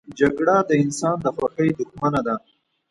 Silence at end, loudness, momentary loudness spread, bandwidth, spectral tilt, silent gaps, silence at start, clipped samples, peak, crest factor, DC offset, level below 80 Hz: 0.55 s; -21 LUFS; 7 LU; 11.5 kHz; -6.5 dB/octave; none; 0.1 s; under 0.1%; -4 dBFS; 18 dB; under 0.1%; -54 dBFS